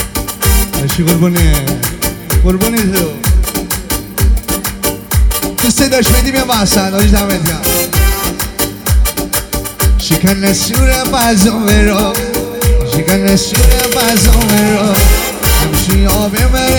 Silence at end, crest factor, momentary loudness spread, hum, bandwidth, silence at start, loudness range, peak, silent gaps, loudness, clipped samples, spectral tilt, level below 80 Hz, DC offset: 0 s; 10 dB; 6 LU; none; over 20 kHz; 0 s; 3 LU; 0 dBFS; none; -11 LUFS; under 0.1%; -4 dB/octave; -14 dBFS; under 0.1%